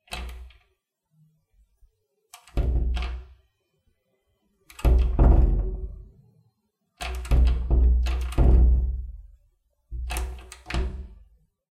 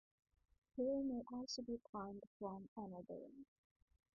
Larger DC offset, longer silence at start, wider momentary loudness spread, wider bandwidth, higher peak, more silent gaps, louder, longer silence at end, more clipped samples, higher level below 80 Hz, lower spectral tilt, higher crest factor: neither; second, 0.1 s vs 0.75 s; first, 21 LU vs 13 LU; first, 12.5 kHz vs 2 kHz; first, -6 dBFS vs -32 dBFS; second, none vs 1.89-1.93 s, 2.27-2.40 s, 2.68-2.76 s; first, -25 LUFS vs -48 LUFS; second, 0.55 s vs 0.75 s; neither; first, -24 dBFS vs -76 dBFS; about the same, -7 dB/octave vs -8 dB/octave; about the same, 18 dB vs 16 dB